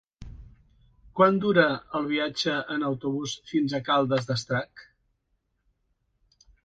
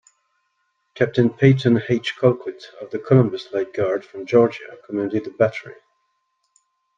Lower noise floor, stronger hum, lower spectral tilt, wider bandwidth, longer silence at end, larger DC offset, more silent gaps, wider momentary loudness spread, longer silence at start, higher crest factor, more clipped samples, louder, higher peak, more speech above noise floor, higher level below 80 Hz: first, -75 dBFS vs -71 dBFS; neither; second, -5.5 dB/octave vs -8 dB/octave; first, 9.2 kHz vs 7.4 kHz; first, 1.85 s vs 1.25 s; neither; neither; second, 9 LU vs 15 LU; second, 0.2 s vs 0.95 s; about the same, 22 dB vs 20 dB; neither; second, -26 LUFS vs -20 LUFS; second, -6 dBFS vs -2 dBFS; about the same, 50 dB vs 52 dB; first, -56 dBFS vs -62 dBFS